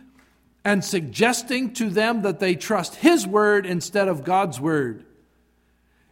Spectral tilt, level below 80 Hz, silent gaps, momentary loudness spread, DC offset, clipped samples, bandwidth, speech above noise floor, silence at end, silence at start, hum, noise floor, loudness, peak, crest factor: -4.5 dB/octave; -64 dBFS; none; 7 LU; under 0.1%; under 0.1%; 16.5 kHz; 42 dB; 1.15 s; 0.65 s; 60 Hz at -50 dBFS; -63 dBFS; -22 LUFS; -2 dBFS; 20 dB